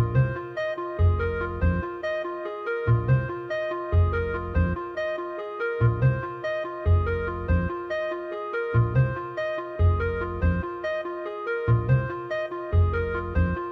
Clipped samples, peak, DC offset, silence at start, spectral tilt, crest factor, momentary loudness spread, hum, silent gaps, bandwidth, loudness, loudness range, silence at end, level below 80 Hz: under 0.1%; -10 dBFS; under 0.1%; 0 s; -9.5 dB/octave; 16 dB; 7 LU; none; none; 6 kHz; -26 LUFS; 0 LU; 0 s; -34 dBFS